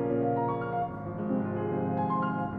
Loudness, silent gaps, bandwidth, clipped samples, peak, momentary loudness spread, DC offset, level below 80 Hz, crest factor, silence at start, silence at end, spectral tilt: -31 LUFS; none; 4.6 kHz; under 0.1%; -18 dBFS; 5 LU; under 0.1%; -58 dBFS; 12 dB; 0 s; 0 s; -11.5 dB/octave